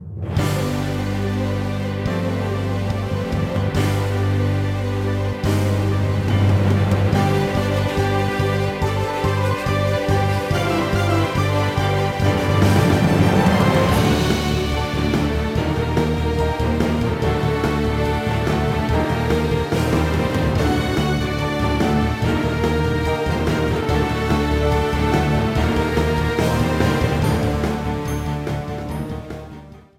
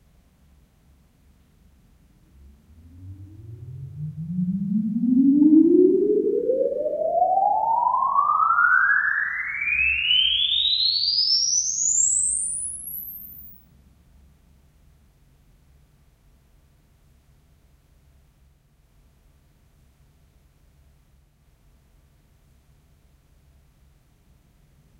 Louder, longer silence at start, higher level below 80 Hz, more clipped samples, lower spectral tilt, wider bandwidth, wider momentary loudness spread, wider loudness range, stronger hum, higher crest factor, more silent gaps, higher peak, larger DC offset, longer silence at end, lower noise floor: about the same, -20 LUFS vs -20 LUFS; second, 0 s vs 2.95 s; first, -30 dBFS vs -56 dBFS; neither; first, -6.5 dB/octave vs -2.5 dB/octave; about the same, 16 kHz vs 16 kHz; second, 6 LU vs 21 LU; second, 4 LU vs 15 LU; neither; about the same, 16 dB vs 20 dB; neither; about the same, -4 dBFS vs -6 dBFS; neither; second, 0.2 s vs 11.45 s; second, -39 dBFS vs -59 dBFS